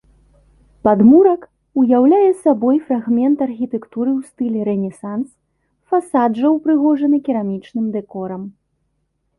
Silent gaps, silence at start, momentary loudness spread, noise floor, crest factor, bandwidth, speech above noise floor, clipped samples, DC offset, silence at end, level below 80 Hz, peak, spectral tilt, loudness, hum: none; 0.85 s; 14 LU; -68 dBFS; 14 dB; 11.5 kHz; 53 dB; under 0.1%; under 0.1%; 0.9 s; -56 dBFS; -2 dBFS; -9 dB/octave; -16 LUFS; none